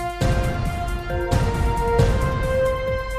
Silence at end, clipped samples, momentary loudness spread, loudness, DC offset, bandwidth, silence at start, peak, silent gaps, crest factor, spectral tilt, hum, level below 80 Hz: 0 s; under 0.1%; 7 LU; -22 LUFS; under 0.1%; 15.5 kHz; 0 s; -6 dBFS; none; 14 dB; -6.5 dB/octave; none; -26 dBFS